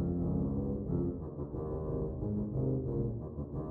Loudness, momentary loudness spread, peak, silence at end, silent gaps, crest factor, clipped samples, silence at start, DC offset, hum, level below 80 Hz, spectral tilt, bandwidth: -36 LUFS; 7 LU; -22 dBFS; 0 s; none; 12 dB; under 0.1%; 0 s; under 0.1%; none; -46 dBFS; -14 dB/octave; 1.9 kHz